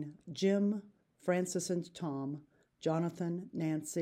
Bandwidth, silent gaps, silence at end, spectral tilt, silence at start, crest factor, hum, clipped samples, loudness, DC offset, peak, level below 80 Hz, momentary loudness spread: 16 kHz; none; 0 s; -6 dB/octave; 0 s; 16 dB; none; under 0.1%; -36 LUFS; under 0.1%; -20 dBFS; -80 dBFS; 10 LU